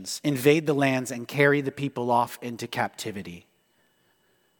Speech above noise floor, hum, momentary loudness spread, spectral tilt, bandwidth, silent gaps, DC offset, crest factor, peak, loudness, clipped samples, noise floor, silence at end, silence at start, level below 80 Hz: 42 dB; none; 13 LU; -5 dB/octave; 19 kHz; none; under 0.1%; 22 dB; -4 dBFS; -25 LUFS; under 0.1%; -67 dBFS; 1.2 s; 0 s; -70 dBFS